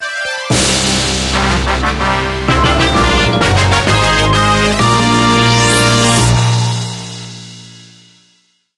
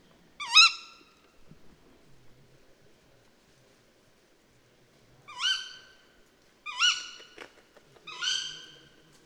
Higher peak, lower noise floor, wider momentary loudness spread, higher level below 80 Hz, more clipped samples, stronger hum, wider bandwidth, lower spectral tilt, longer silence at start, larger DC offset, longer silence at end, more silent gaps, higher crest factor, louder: first, 0 dBFS vs -4 dBFS; second, -56 dBFS vs -63 dBFS; second, 10 LU vs 30 LU; first, -24 dBFS vs -72 dBFS; neither; neither; second, 12.5 kHz vs over 20 kHz; first, -4 dB/octave vs 2.5 dB/octave; second, 0 s vs 0.4 s; neither; first, 0.95 s vs 0.6 s; neither; second, 12 dB vs 30 dB; first, -11 LUFS vs -24 LUFS